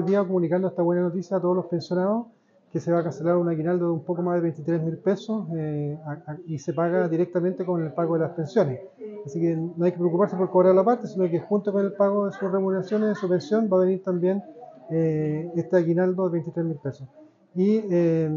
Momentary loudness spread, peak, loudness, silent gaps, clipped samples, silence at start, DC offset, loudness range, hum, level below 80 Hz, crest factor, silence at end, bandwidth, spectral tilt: 10 LU; -8 dBFS; -24 LUFS; none; under 0.1%; 0 s; under 0.1%; 4 LU; none; -74 dBFS; 16 dB; 0 s; 7.2 kHz; -8.5 dB/octave